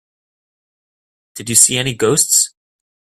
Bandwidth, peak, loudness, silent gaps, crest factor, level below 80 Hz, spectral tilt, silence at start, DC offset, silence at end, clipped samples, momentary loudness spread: 16 kHz; 0 dBFS; -12 LUFS; none; 18 dB; -54 dBFS; -2 dB/octave; 1.35 s; under 0.1%; 0.55 s; under 0.1%; 9 LU